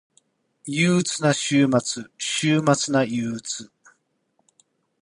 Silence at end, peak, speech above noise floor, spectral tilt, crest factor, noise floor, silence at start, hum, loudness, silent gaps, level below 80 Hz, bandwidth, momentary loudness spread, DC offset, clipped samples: 1.35 s; -6 dBFS; 48 dB; -4.5 dB/octave; 18 dB; -70 dBFS; 0.65 s; none; -22 LUFS; none; -64 dBFS; 11 kHz; 11 LU; under 0.1%; under 0.1%